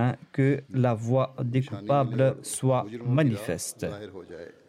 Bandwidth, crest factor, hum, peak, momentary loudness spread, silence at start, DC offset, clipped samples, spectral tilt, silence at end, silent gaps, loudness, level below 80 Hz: 14 kHz; 16 dB; none; -12 dBFS; 11 LU; 0 s; under 0.1%; under 0.1%; -6.5 dB/octave; 0.2 s; none; -27 LUFS; -64 dBFS